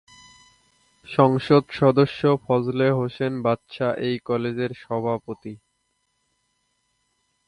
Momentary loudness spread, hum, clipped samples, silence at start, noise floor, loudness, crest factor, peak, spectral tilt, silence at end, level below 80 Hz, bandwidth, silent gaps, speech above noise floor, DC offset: 10 LU; none; under 0.1%; 1.1 s; -72 dBFS; -22 LUFS; 22 dB; -2 dBFS; -8 dB/octave; 1.9 s; -60 dBFS; 10.5 kHz; none; 51 dB; under 0.1%